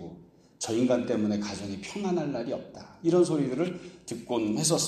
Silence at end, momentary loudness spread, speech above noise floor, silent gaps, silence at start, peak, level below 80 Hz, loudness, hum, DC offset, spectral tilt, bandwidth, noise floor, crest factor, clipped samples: 0 s; 15 LU; 23 dB; none; 0 s; -10 dBFS; -64 dBFS; -29 LUFS; none; under 0.1%; -5 dB/octave; 14 kHz; -51 dBFS; 18 dB; under 0.1%